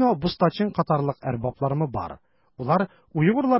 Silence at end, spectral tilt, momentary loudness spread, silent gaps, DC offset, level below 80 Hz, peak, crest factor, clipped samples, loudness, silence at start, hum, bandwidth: 0 s; -11.5 dB/octave; 7 LU; none; under 0.1%; -50 dBFS; -8 dBFS; 16 dB; under 0.1%; -25 LUFS; 0 s; none; 5.8 kHz